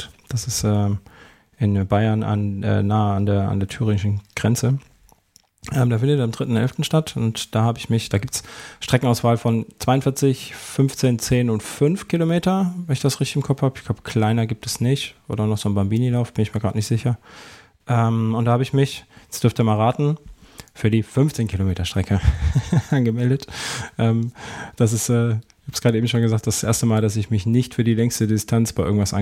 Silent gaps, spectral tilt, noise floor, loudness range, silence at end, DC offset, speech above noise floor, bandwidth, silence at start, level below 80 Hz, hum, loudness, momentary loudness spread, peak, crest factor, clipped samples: none; -6 dB/octave; -58 dBFS; 2 LU; 0 s; under 0.1%; 38 dB; 16 kHz; 0 s; -38 dBFS; none; -21 LUFS; 6 LU; -4 dBFS; 16 dB; under 0.1%